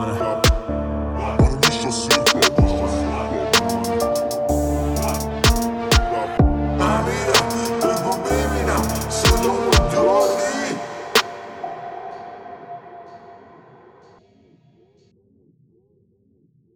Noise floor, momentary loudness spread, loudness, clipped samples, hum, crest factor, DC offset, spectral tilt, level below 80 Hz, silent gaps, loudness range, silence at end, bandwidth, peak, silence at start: -60 dBFS; 16 LU; -19 LUFS; under 0.1%; none; 20 dB; under 0.1%; -4 dB/octave; -28 dBFS; none; 9 LU; 3.4 s; 19.5 kHz; 0 dBFS; 0 s